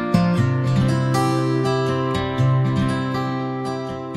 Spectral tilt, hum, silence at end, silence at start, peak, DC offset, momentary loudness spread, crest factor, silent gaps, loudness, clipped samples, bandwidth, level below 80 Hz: -7 dB/octave; none; 0 s; 0 s; -4 dBFS; under 0.1%; 6 LU; 16 dB; none; -20 LUFS; under 0.1%; 12 kHz; -42 dBFS